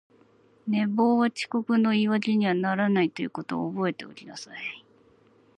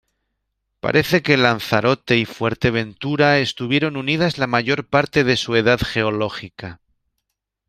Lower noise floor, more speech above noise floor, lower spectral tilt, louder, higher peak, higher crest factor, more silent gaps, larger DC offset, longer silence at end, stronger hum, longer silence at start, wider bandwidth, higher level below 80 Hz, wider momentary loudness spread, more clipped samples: second, -60 dBFS vs -77 dBFS; second, 34 dB vs 59 dB; about the same, -6.5 dB/octave vs -5.5 dB/octave; second, -26 LUFS vs -18 LUFS; second, -10 dBFS vs 0 dBFS; about the same, 16 dB vs 20 dB; neither; neither; second, 0.8 s vs 0.95 s; neither; second, 0.65 s vs 0.85 s; second, 9.8 kHz vs 15.5 kHz; second, -74 dBFS vs -48 dBFS; first, 17 LU vs 9 LU; neither